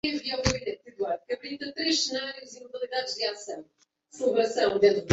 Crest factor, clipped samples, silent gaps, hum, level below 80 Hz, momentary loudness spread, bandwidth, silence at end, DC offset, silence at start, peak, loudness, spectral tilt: 22 dB; under 0.1%; none; none; -52 dBFS; 15 LU; 8.2 kHz; 0 s; under 0.1%; 0.05 s; -6 dBFS; -28 LUFS; -3.5 dB/octave